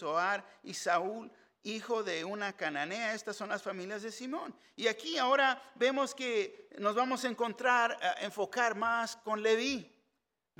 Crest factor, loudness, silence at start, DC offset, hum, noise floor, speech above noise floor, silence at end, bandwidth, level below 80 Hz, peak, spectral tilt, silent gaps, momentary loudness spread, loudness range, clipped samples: 20 dB; -33 LUFS; 0 s; under 0.1%; none; -83 dBFS; 50 dB; 0.75 s; 17.5 kHz; -80 dBFS; -14 dBFS; -2.5 dB/octave; none; 12 LU; 6 LU; under 0.1%